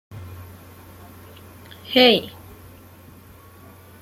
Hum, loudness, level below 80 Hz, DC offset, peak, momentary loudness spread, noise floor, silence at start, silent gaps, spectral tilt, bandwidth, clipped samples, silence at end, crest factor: none; -16 LUFS; -58 dBFS; under 0.1%; -4 dBFS; 29 LU; -46 dBFS; 0.1 s; none; -4.5 dB/octave; 16 kHz; under 0.1%; 1.75 s; 22 dB